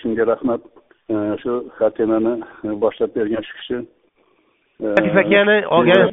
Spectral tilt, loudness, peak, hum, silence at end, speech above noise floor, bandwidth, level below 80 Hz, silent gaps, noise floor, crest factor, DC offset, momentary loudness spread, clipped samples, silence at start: -4 dB/octave; -18 LUFS; 0 dBFS; none; 0 s; 43 dB; 4.2 kHz; -56 dBFS; none; -61 dBFS; 18 dB; under 0.1%; 14 LU; under 0.1%; 0.05 s